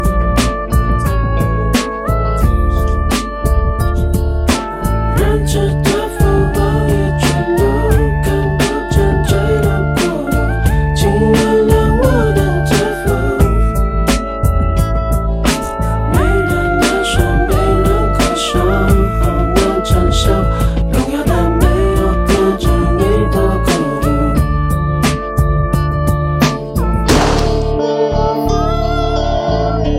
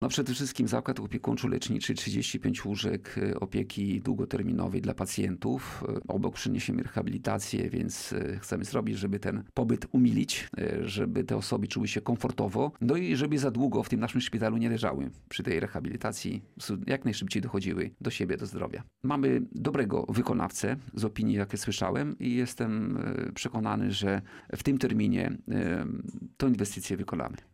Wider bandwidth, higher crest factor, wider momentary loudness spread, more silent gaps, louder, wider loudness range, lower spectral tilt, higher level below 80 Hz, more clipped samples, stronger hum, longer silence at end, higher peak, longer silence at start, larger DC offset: about the same, 16 kHz vs 16 kHz; about the same, 12 dB vs 16 dB; about the same, 4 LU vs 6 LU; neither; first, -14 LUFS vs -31 LUFS; about the same, 2 LU vs 3 LU; about the same, -6 dB/octave vs -5.5 dB/octave; first, -16 dBFS vs -56 dBFS; neither; neither; second, 0 s vs 0.2 s; first, 0 dBFS vs -14 dBFS; about the same, 0 s vs 0 s; neither